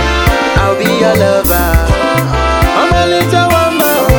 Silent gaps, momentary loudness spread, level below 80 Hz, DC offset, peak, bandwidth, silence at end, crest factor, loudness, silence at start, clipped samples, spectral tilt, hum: none; 2 LU; -18 dBFS; 0.3%; 0 dBFS; 20 kHz; 0 s; 10 dB; -10 LUFS; 0 s; 0.4%; -5 dB/octave; none